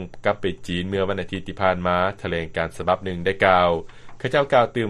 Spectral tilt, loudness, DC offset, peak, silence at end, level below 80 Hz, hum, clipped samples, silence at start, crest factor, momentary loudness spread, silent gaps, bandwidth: -6 dB/octave; -22 LUFS; under 0.1%; -2 dBFS; 0 s; -46 dBFS; none; under 0.1%; 0 s; 20 dB; 10 LU; none; 12 kHz